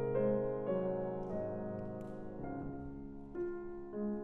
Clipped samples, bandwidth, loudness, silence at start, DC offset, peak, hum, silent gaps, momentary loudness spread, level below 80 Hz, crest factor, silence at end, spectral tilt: under 0.1%; 3.6 kHz; -40 LUFS; 0 s; under 0.1%; -22 dBFS; none; none; 12 LU; -56 dBFS; 16 dB; 0 s; -11 dB/octave